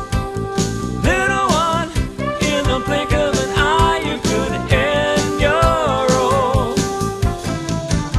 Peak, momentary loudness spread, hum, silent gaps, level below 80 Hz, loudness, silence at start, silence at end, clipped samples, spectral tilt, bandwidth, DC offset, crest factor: 0 dBFS; 7 LU; none; none; -28 dBFS; -17 LUFS; 0 s; 0 s; under 0.1%; -5 dB/octave; 13 kHz; under 0.1%; 16 dB